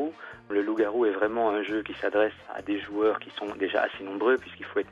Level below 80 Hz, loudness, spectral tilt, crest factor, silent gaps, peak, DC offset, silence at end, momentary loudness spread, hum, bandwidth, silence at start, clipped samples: -64 dBFS; -28 LUFS; -6 dB/octave; 18 dB; none; -10 dBFS; under 0.1%; 0 s; 7 LU; none; 7.2 kHz; 0 s; under 0.1%